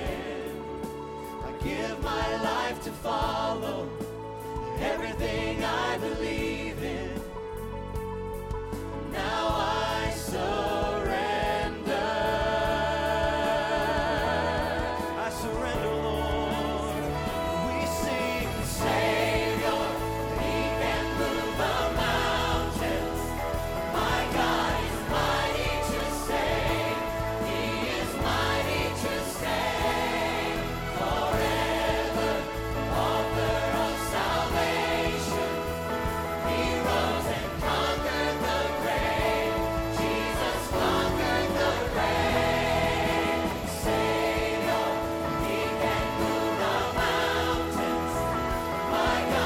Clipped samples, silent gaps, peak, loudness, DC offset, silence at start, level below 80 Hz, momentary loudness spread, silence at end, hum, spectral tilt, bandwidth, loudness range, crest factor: under 0.1%; none; -12 dBFS; -28 LUFS; under 0.1%; 0 s; -40 dBFS; 7 LU; 0 s; none; -4.5 dB/octave; 17 kHz; 5 LU; 16 dB